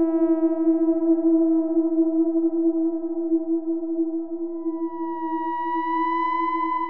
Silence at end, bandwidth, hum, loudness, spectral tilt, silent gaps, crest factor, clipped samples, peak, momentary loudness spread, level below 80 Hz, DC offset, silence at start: 0 s; 3.2 kHz; none; -23 LUFS; -8 dB/octave; none; 12 dB; under 0.1%; -10 dBFS; 9 LU; -70 dBFS; 1%; 0 s